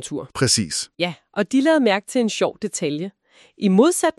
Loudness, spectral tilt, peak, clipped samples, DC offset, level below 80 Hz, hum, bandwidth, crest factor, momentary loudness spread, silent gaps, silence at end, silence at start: -20 LUFS; -4 dB/octave; -4 dBFS; under 0.1%; under 0.1%; -58 dBFS; none; 13 kHz; 18 dB; 10 LU; none; 0.1 s; 0 s